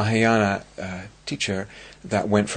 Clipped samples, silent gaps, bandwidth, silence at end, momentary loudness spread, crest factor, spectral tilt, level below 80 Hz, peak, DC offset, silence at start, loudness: under 0.1%; none; 9.4 kHz; 0 s; 15 LU; 20 dB; -5 dB/octave; -54 dBFS; -4 dBFS; under 0.1%; 0 s; -24 LUFS